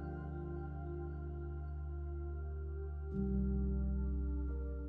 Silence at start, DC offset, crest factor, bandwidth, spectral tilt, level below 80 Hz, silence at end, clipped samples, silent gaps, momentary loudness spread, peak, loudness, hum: 0 s; under 0.1%; 12 dB; 1.7 kHz; -12 dB/octave; -40 dBFS; 0 s; under 0.1%; none; 7 LU; -26 dBFS; -41 LUFS; none